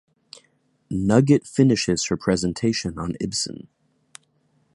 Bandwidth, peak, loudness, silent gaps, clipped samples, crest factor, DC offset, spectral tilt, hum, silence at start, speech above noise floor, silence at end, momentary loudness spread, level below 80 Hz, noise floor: 11.5 kHz; -2 dBFS; -22 LUFS; none; under 0.1%; 20 dB; under 0.1%; -5.5 dB/octave; none; 0.9 s; 44 dB; 1.25 s; 11 LU; -48 dBFS; -65 dBFS